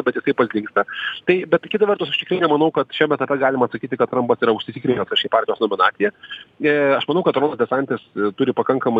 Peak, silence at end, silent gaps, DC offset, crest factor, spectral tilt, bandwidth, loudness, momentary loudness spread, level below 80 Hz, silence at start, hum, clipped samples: -2 dBFS; 0 s; none; under 0.1%; 18 dB; -7.5 dB/octave; 7.2 kHz; -19 LUFS; 5 LU; -64 dBFS; 0 s; none; under 0.1%